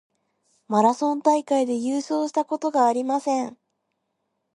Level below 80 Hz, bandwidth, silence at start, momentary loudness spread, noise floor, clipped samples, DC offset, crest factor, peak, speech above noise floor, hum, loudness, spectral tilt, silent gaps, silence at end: -78 dBFS; 11.5 kHz; 0.7 s; 5 LU; -76 dBFS; under 0.1%; under 0.1%; 20 dB; -4 dBFS; 54 dB; none; -23 LUFS; -5 dB/octave; none; 1.05 s